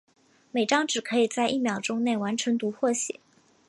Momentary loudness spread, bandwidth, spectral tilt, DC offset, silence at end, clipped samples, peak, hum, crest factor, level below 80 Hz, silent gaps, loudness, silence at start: 6 LU; 11.5 kHz; -3 dB/octave; under 0.1%; 0.55 s; under 0.1%; -8 dBFS; none; 18 dB; -76 dBFS; none; -26 LUFS; 0.55 s